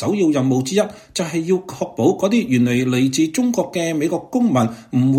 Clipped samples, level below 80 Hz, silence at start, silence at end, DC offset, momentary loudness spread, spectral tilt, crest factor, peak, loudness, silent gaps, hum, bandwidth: under 0.1%; -56 dBFS; 0 s; 0 s; under 0.1%; 5 LU; -6 dB/octave; 14 dB; -4 dBFS; -19 LUFS; none; none; 16 kHz